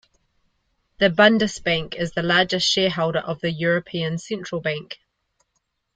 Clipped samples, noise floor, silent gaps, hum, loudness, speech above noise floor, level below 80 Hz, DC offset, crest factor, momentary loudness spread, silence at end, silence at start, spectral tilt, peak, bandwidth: under 0.1%; -74 dBFS; none; none; -21 LUFS; 53 dB; -54 dBFS; under 0.1%; 20 dB; 13 LU; 1 s; 1 s; -4.5 dB/octave; -2 dBFS; 9.2 kHz